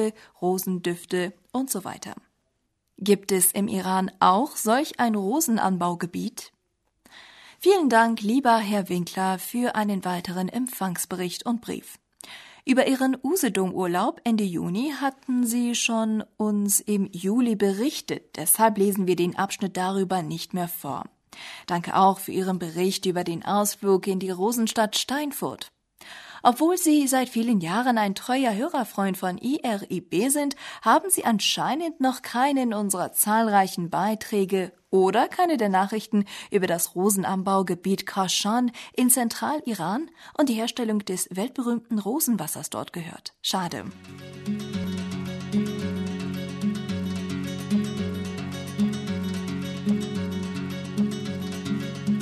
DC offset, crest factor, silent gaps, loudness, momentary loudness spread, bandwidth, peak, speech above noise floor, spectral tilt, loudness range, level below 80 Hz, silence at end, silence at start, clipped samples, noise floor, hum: under 0.1%; 20 dB; none; -25 LUFS; 11 LU; 13.5 kHz; -4 dBFS; 50 dB; -4 dB/octave; 6 LU; -66 dBFS; 0 s; 0 s; under 0.1%; -74 dBFS; none